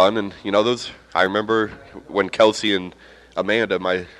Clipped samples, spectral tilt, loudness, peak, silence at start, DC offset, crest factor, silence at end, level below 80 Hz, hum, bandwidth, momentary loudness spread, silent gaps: under 0.1%; -4.5 dB/octave; -20 LUFS; -2 dBFS; 0 s; under 0.1%; 18 dB; 0.1 s; -56 dBFS; none; 11.5 kHz; 10 LU; none